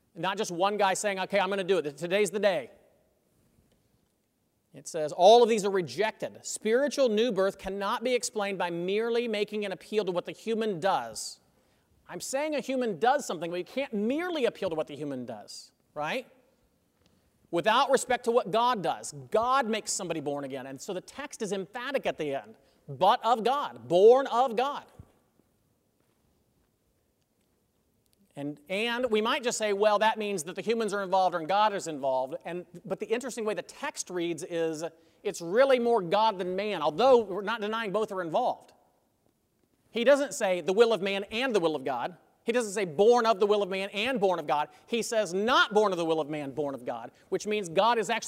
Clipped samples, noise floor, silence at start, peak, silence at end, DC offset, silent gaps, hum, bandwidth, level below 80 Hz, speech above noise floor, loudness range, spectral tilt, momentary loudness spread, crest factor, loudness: under 0.1%; -74 dBFS; 0.15 s; -8 dBFS; 0 s; under 0.1%; none; none; 16 kHz; -70 dBFS; 46 dB; 7 LU; -3.5 dB/octave; 14 LU; 20 dB; -28 LUFS